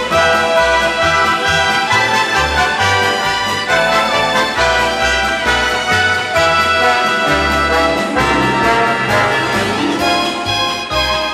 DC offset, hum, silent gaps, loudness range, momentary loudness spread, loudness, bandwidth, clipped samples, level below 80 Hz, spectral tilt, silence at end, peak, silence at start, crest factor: under 0.1%; none; none; 1 LU; 3 LU; -13 LUFS; 16 kHz; under 0.1%; -34 dBFS; -3 dB/octave; 0 s; 0 dBFS; 0 s; 14 dB